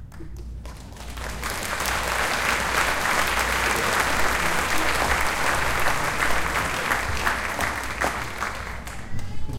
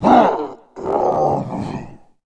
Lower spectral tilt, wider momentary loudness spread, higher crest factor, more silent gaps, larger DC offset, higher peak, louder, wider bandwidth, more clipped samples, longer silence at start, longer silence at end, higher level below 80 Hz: second, -2.5 dB/octave vs -7.5 dB/octave; second, 14 LU vs 17 LU; about the same, 18 dB vs 18 dB; neither; neither; second, -6 dBFS vs 0 dBFS; second, -23 LUFS vs -18 LUFS; first, 17 kHz vs 9.2 kHz; neither; about the same, 0 s vs 0 s; second, 0 s vs 0.3 s; first, -36 dBFS vs -46 dBFS